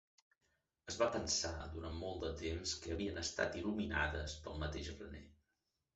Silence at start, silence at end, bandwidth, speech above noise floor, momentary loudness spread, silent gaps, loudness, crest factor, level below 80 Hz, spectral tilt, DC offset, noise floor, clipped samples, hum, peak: 0.85 s; 0.6 s; 8.2 kHz; 46 dB; 11 LU; none; -41 LUFS; 22 dB; -52 dBFS; -3.5 dB/octave; under 0.1%; -87 dBFS; under 0.1%; none; -22 dBFS